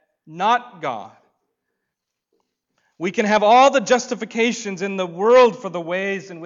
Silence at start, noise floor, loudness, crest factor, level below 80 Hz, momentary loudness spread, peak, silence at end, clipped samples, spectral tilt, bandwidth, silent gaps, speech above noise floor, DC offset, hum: 0.3 s; -80 dBFS; -18 LUFS; 14 dB; -66 dBFS; 15 LU; -6 dBFS; 0 s; under 0.1%; -4 dB/octave; 7.6 kHz; none; 62 dB; under 0.1%; none